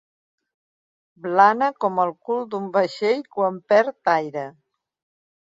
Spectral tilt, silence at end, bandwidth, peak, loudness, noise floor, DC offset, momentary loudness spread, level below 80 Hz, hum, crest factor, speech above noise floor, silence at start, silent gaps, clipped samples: -6 dB/octave; 1.1 s; 7.8 kHz; -2 dBFS; -21 LUFS; under -90 dBFS; under 0.1%; 12 LU; -74 dBFS; none; 22 dB; over 69 dB; 1.25 s; none; under 0.1%